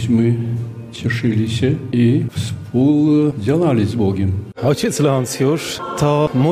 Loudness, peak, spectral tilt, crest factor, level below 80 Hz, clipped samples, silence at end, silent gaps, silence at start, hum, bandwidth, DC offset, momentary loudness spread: -17 LUFS; -2 dBFS; -6.5 dB/octave; 14 dB; -50 dBFS; under 0.1%; 0 s; none; 0 s; none; 15.5 kHz; under 0.1%; 8 LU